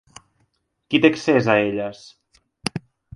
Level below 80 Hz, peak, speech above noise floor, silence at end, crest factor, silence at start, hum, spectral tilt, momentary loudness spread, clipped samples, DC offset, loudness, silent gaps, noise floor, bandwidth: -60 dBFS; -2 dBFS; 50 dB; 0.35 s; 22 dB; 0.9 s; none; -5.5 dB/octave; 14 LU; under 0.1%; under 0.1%; -20 LUFS; none; -68 dBFS; 11.5 kHz